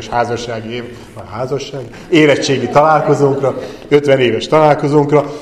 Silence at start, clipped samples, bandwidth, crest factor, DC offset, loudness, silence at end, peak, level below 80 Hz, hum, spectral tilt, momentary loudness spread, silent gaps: 0 s; under 0.1%; 11 kHz; 14 dB; under 0.1%; -13 LUFS; 0 s; 0 dBFS; -44 dBFS; none; -6 dB/octave; 15 LU; none